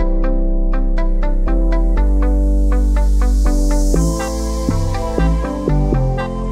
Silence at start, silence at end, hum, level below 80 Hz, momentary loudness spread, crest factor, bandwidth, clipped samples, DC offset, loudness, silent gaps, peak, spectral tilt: 0 s; 0 s; none; -14 dBFS; 4 LU; 12 dB; 11.5 kHz; under 0.1%; under 0.1%; -18 LUFS; none; 0 dBFS; -7 dB/octave